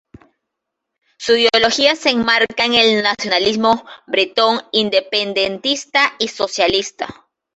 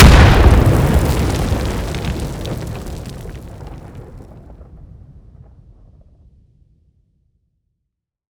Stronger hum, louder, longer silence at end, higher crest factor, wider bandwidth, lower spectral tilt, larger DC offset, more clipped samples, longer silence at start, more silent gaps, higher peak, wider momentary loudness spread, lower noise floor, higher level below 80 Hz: neither; about the same, -15 LUFS vs -15 LUFS; second, 0.45 s vs 3.7 s; about the same, 16 dB vs 16 dB; second, 8.2 kHz vs 20 kHz; second, -2.5 dB/octave vs -6 dB/octave; neither; second, under 0.1% vs 0.4%; first, 1.2 s vs 0 s; neither; about the same, 0 dBFS vs 0 dBFS; second, 8 LU vs 25 LU; about the same, -78 dBFS vs -77 dBFS; second, -54 dBFS vs -20 dBFS